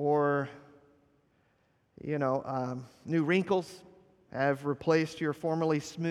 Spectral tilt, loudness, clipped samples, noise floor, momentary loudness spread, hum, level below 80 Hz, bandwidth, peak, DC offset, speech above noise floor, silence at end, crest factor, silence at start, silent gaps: -6.5 dB/octave; -31 LUFS; under 0.1%; -71 dBFS; 14 LU; none; -72 dBFS; 13 kHz; -14 dBFS; under 0.1%; 40 dB; 0 s; 18 dB; 0 s; none